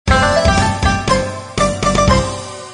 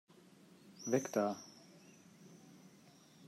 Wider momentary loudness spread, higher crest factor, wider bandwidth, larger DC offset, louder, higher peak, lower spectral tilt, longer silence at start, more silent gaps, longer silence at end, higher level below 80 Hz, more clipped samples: second, 8 LU vs 26 LU; second, 14 dB vs 24 dB; second, 10.5 kHz vs 16 kHz; neither; first, -15 LUFS vs -38 LUFS; first, 0 dBFS vs -20 dBFS; about the same, -4.5 dB/octave vs -5 dB/octave; second, 0.05 s vs 0.65 s; neither; about the same, 0 s vs 0 s; first, -24 dBFS vs under -90 dBFS; neither